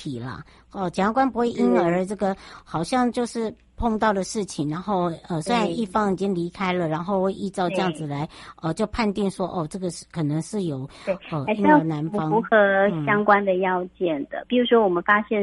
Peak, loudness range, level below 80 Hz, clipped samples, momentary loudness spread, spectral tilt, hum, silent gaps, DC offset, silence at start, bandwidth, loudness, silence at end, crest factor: -4 dBFS; 6 LU; -48 dBFS; under 0.1%; 12 LU; -6 dB/octave; none; none; under 0.1%; 0 s; 11.5 kHz; -23 LUFS; 0 s; 20 dB